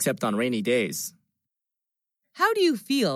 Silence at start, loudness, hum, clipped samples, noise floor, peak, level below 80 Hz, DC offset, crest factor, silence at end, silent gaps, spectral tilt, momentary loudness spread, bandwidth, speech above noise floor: 0 s; -25 LUFS; none; under 0.1%; -87 dBFS; -10 dBFS; -84 dBFS; under 0.1%; 16 dB; 0 s; none; -4 dB/octave; 9 LU; 16.5 kHz; 63 dB